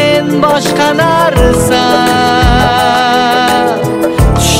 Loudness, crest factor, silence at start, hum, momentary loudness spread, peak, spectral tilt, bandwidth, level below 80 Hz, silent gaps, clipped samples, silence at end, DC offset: -9 LUFS; 8 dB; 0 s; none; 2 LU; 0 dBFS; -4.5 dB/octave; 16.5 kHz; -18 dBFS; none; under 0.1%; 0 s; under 0.1%